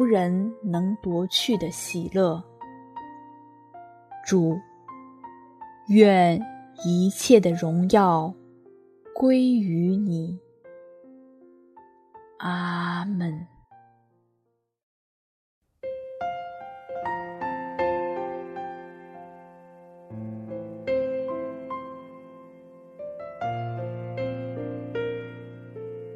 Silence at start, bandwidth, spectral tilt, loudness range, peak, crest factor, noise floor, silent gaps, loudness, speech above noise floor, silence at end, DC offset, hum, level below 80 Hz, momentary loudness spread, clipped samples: 0 s; 13.5 kHz; -6 dB/octave; 13 LU; -2 dBFS; 24 dB; -74 dBFS; 14.83-15.61 s; -25 LUFS; 52 dB; 0 s; under 0.1%; none; -64 dBFS; 24 LU; under 0.1%